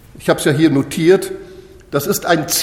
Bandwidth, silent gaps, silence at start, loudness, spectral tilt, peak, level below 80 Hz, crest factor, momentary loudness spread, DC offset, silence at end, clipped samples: 17 kHz; none; 0.15 s; -15 LUFS; -4.5 dB/octave; 0 dBFS; -46 dBFS; 16 dB; 10 LU; under 0.1%; 0 s; under 0.1%